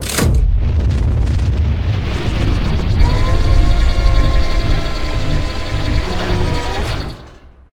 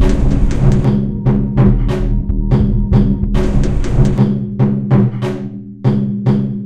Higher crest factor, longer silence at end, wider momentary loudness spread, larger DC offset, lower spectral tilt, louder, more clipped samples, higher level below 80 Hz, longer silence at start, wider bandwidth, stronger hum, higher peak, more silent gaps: about the same, 14 dB vs 12 dB; first, 0.4 s vs 0 s; about the same, 6 LU vs 5 LU; neither; second, -5.5 dB/octave vs -9 dB/octave; about the same, -17 LUFS vs -15 LUFS; neither; about the same, -16 dBFS vs -18 dBFS; about the same, 0 s vs 0 s; first, 16.5 kHz vs 8.8 kHz; neither; about the same, 0 dBFS vs 0 dBFS; neither